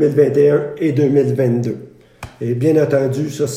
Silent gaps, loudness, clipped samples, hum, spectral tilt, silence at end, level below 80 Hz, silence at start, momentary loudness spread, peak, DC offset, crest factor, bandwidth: none; -16 LUFS; under 0.1%; none; -7.5 dB/octave; 0 s; -54 dBFS; 0 s; 10 LU; 0 dBFS; under 0.1%; 14 dB; 15 kHz